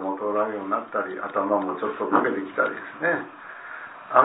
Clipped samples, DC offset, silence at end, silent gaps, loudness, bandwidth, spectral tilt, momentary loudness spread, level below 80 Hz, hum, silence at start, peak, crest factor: under 0.1%; under 0.1%; 0 s; none; -26 LUFS; 4 kHz; -9.5 dB/octave; 15 LU; -76 dBFS; none; 0 s; 0 dBFS; 24 dB